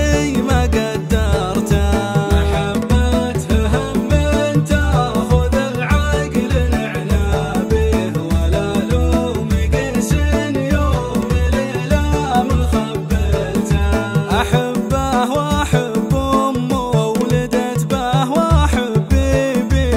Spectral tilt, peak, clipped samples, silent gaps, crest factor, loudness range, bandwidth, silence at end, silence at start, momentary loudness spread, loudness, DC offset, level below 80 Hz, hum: -6.5 dB/octave; -2 dBFS; under 0.1%; none; 14 dB; 1 LU; 16 kHz; 0 s; 0 s; 3 LU; -17 LUFS; under 0.1%; -20 dBFS; none